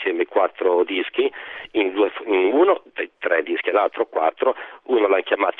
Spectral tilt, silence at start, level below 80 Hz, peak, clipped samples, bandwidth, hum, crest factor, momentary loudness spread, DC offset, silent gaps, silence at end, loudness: -6.5 dB/octave; 0 s; -70 dBFS; -4 dBFS; under 0.1%; 4 kHz; none; 16 dB; 7 LU; under 0.1%; none; 0.05 s; -21 LUFS